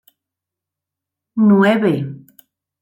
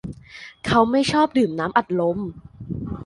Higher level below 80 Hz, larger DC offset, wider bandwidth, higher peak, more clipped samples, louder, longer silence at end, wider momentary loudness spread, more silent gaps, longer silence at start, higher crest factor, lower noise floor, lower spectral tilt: second, -66 dBFS vs -46 dBFS; neither; first, 15.5 kHz vs 11.5 kHz; about the same, -2 dBFS vs -4 dBFS; neither; first, -15 LUFS vs -21 LUFS; first, 0.65 s vs 0 s; second, 16 LU vs 19 LU; neither; first, 1.35 s vs 0.05 s; about the same, 16 dB vs 18 dB; first, -85 dBFS vs -43 dBFS; first, -8.5 dB/octave vs -6 dB/octave